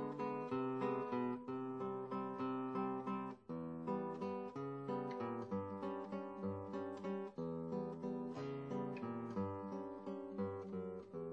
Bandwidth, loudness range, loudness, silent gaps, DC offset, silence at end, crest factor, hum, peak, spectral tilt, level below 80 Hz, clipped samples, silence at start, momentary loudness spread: 8.2 kHz; 3 LU; -44 LUFS; none; under 0.1%; 0 s; 16 dB; none; -28 dBFS; -9 dB/octave; -80 dBFS; under 0.1%; 0 s; 6 LU